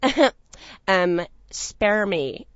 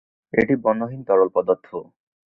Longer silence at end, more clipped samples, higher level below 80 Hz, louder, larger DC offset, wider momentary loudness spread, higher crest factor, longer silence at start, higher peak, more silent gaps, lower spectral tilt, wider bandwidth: second, 0.15 s vs 0.5 s; neither; first, -48 dBFS vs -58 dBFS; about the same, -22 LUFS vs -21 LUFS; neither; about the same, 11 LU vs 10 LU; about the same, 22 dB vs 20 dB; second, 0 s vs 0.35 s; about the same, -2 dBFS vs -2 dBFS; neither; second, -4 dB/octave vs -9.5 dB/octave; first, 8 kHz vs 4.6 kHz